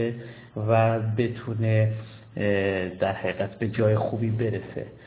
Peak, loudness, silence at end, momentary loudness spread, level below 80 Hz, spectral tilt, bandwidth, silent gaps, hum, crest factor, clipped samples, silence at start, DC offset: -8 dBFS; -26 LUFS; 0 s; 12 LU; -52 dBFS; -11.5 dB/octave; 4 kHz; none; none; 18 dB; under 0.1%; 0 s; under 0.1%